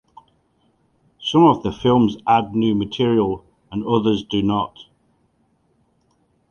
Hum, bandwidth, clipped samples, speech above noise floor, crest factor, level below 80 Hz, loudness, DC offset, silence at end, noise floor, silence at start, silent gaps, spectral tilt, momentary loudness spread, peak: none; 7 kHz; under 0.1%; 46 dB; 18 dB; -50 dBFS; -19 LUFS; under 0.1%; 1.7 s; -63 dBFS; 1.2 s; none; -7.5 dB/octave; 14 LU; -2 dBFS